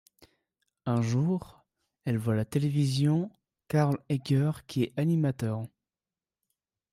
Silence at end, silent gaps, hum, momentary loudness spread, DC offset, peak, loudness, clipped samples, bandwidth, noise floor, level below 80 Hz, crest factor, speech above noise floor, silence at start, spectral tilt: 1.25 s; none; none; 9 LU; under 0.1%; -14 dBFS; -29 LUFS; under 0.1%; 14.5 kHz; under -90 dBFS; -66 dBFS; 16 dB; over 63 dB; 0.85 s; -7.5 dB/octave